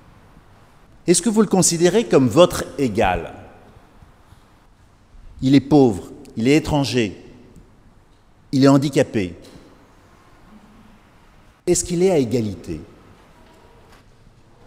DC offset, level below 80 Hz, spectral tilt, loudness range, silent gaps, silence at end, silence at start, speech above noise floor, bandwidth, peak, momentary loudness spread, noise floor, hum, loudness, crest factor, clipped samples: under 0.1%; -44 dBFS; -5 dB/octave; 6 LU; none; 1.8 s; 1.05 s; 35 dB; 16 kHz; 0 dBFS; 15 LU; -51 dBFS; none; -18 LUFS; 20 dB; under 0.1%